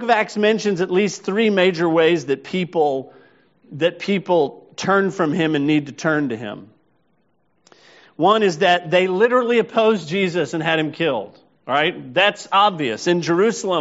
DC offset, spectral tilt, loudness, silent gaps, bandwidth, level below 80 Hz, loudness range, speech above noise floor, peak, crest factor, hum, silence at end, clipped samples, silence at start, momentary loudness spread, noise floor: under 0.1%; -3.5 dB/octave; -19 LUFS; none; 8 kHz; -66 dBFS; 4 LU; 47 dB; -2 dBFS; 18 dB; none; 0 s; under 0.1%; 0 s; 7 LU; -66 dBFS